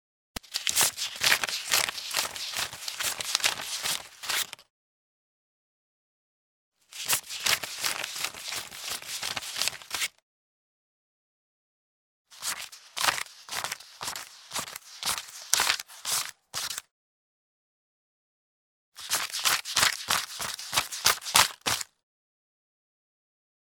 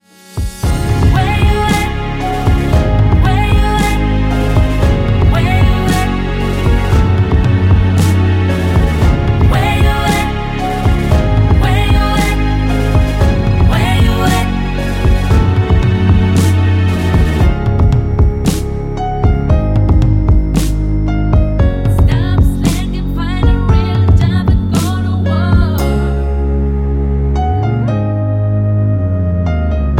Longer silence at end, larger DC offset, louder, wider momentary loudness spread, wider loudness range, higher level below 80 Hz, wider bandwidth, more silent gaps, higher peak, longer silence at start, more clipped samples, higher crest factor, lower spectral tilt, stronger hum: first, 1.8 s vs 0 s; neither; second, -28 LUFS vs -13 LUFS; first, 12 LU vs 5 LU; first, 9 LU vs 2 LU; second, -64 dBFS vs -16 dBFS; first, over 20 kHz vs 16 kHz; first, 4.70-6.72 s, 10.22-12.25 s, 16.91-18.92 s vs none; about the same, 0 dBFS vs 0 dBFS; first, 0.5 s vs 0.3 s; neither; first, 32 dB vs 10 dB; second, 1 dB/octave vs -7 dB/octave; neither